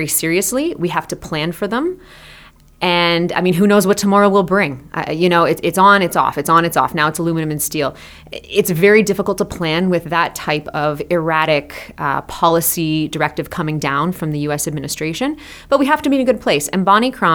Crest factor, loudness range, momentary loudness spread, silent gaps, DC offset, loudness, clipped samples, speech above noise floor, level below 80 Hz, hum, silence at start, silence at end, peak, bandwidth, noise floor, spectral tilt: 16 dB; 5 LU; 9 LU; none; under 0.1%; -16 LUFS; under 0.1%; 27 dB; -46 dBFS; none; 0 s; 0 s; 0 dBFS; over 20 kHz; -43 dBFS; -4.5 dB/octave